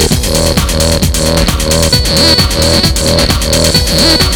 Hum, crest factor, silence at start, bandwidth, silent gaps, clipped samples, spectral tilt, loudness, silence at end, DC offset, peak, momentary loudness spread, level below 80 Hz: none; 10 dB; 0 s; over 20 kHz; none; 0.1%; -3.5 dB/octave; -8 LUFS; 0 s; under 0.1%; 0 dBFS; 4 LU; -16 dBFS